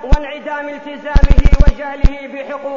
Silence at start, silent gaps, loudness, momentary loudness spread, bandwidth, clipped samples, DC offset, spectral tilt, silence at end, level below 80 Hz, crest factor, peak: 0 s; none; -17 LUFS; 13 LU; 7 kHz; 1%; under 0.1%; -7.5 dB/octave; 0 s; -12 dBFS; 12 dB; 0 dBFS